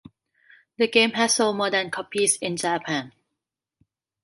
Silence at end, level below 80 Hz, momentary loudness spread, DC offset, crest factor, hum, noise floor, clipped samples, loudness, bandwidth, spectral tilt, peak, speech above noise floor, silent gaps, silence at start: 1.15 s; -72 dBFS; 9 LU; under 0.1%; 20 dB; none; -84 dBFS; under 0.1%; -22 LUFS; 11.5 kHz; -2 dB/octave; -4 dBFS; 61 dB; none; 0.8 s